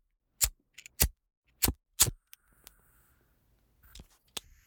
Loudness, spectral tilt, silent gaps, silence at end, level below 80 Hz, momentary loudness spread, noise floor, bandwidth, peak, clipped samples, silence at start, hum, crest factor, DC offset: -29 LUFS; -1.5 dB/octave; 1.37-1.42 s; 0.25 s; -46 dBFS; 17 LU; -70 dBFS; over 20 kHz; -6 dBFS; under 0.1%; 0.4 s; none; 30 dB; under 0.1%